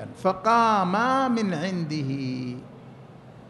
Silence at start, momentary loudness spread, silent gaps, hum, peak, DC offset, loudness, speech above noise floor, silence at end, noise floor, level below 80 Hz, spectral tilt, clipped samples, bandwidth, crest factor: 0 s; 12 LU; none; none; -8 dBFS; under 0.1%; -24 LUFS; 22 dB; 0 s; -46 dBFS; -64 dBFS; -6 dB/octave; under 0.1%; 11.5 kHz; 18 dB